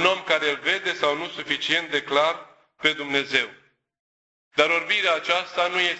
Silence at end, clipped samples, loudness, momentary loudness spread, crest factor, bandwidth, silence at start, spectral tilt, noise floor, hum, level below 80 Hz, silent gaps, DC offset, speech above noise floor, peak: 0 s; under 0.1%; -23 LUFS; 6 LU; 22 dB; 8.4 kHz; 0 s; -2.5 dB/octave; under -90 dBFS; none; -66 dBFS; 4.00-4.51 s; under 0.1%; over 66 dB; -2 dBFS